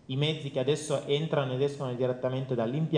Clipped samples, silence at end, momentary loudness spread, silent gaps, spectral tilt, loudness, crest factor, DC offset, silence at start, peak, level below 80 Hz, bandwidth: under 0.1%; 0 s; 3 LU; none; -6 dB/octave; -30 LUFS; 16 dB; under 0.1%; 0.1 s; -12 dBFS; -68 dBFS; 10 kHz